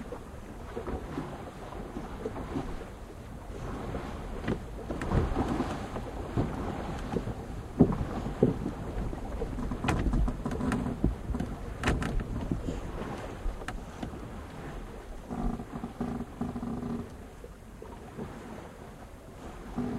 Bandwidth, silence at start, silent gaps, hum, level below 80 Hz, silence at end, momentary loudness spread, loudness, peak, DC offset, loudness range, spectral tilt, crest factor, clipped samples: 14 kHz; 0 s; none; none; -40 dBFS; 0 s; 15 LU; -35 LUFS; -8 dBFS; under 0.1%; 8 LU; -7 dB/octave; 26 dB; under 0.1%